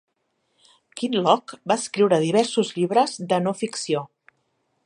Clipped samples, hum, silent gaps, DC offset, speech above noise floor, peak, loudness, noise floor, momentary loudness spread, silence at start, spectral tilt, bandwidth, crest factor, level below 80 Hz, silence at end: under 0.1%; none; none; under 0.1%; 51 dB; -2 dBFS; -22 LUFS; -72 dBFS; 8 LU; 0.95 s; -4.5 dB/octave; 11 kHz; 20 dB; -74 dBFS; 0.8 s